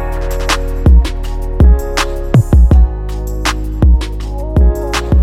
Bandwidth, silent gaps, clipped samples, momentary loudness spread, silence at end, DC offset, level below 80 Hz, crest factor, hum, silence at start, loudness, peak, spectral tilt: 13.5 kHz; none; under 0.1%; 12 LU; 0 s; under 0.1%; -12 dBFS; 10 dB; none; 0 s; -13 LUFS; 0 dBFS; -6 dB/octave